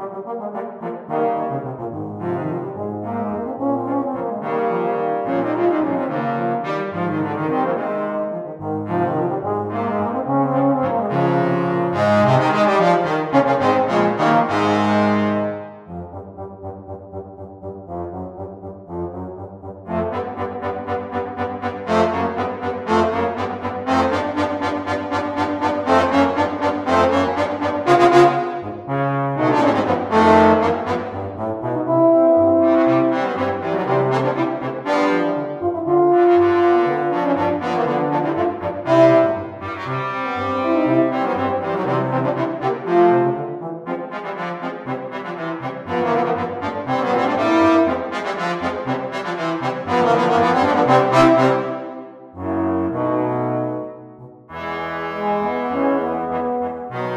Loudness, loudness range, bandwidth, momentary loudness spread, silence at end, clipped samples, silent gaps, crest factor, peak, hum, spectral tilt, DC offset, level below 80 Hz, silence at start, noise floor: -19 LUFS; 8 LU; 9.8 kHz; 14 LU; 0 s; under 0.1%; none; 18 dB; 0 dBFS; none; -7 dB/octave; under 0.1%; -54 dBFS; 0 s; -40 dBFS